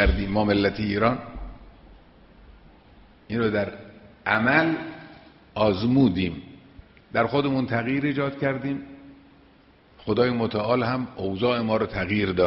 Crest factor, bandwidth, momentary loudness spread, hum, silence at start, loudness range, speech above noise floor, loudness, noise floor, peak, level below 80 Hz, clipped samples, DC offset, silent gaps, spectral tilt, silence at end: 20 dB; 5.8 kHz; 17 LU; none; 0 s; 4 LU; 32 dB; -24 LUFS; -55 dBFS; -4 dBFS; -40 dBFS; under 0.1%; under 0.1%; none; -5 dB/octave; 0 s